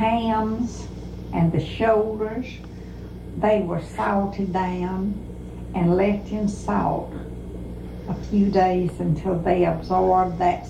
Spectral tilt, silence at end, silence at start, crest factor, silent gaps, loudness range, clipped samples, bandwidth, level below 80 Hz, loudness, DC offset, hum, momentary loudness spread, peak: -8 dB/octave; 0 s; 0 s; 16 dB; none; 3 LU; under 0.1%; 10.5 kHz; -38 dBFS; -23 LUFS; under 0.1%; 60 Hz at -40 dBFS; 15 LU; -6 dBFS